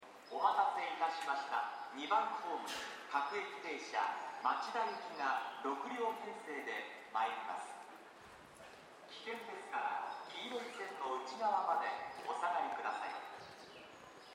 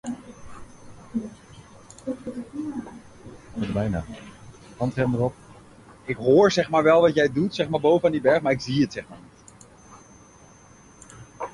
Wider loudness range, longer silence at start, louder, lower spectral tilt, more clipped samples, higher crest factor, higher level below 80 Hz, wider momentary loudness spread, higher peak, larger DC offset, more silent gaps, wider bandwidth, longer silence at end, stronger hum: second, 6 LU vs 13 LU; about the same, 0 s vs 0.05 s; second, -40 LUFS vs -23 LUFS; second, -2 dB/octave vs -6 dB/octave; neither; about the same, 22 dB vs 18 dB; second, -86 dBFS vs -52 dBFS; second, 18 LU vs 24 LU; second, -20 dBFS vs -6 dBFS; neither; neither; first, 16 kHz vs 11.5 kHz; about the same, 0 s vs 0.05 s; neither